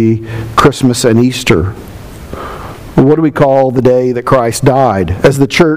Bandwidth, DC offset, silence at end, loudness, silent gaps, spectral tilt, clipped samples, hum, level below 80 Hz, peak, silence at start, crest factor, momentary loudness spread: 16 kHz; 1%; 0 s; -10 LUFS; none; -6 dB/octave; 1%; none; -32 dBFS; 0 dBFS; 0 s; 10 dB; 16 LU